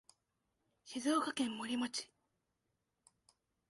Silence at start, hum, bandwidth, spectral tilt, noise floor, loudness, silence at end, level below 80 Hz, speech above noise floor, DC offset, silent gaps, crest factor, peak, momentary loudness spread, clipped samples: 0.85 s; none; 11.5 kHz; -2.5 dB/octave; -86 dBFS; -38 LUFS; 1.65 s; -84 dBFS; 48 dB; under 0.1%; none; 20 dB; -24 dBFS; 11 LU; under 0.1%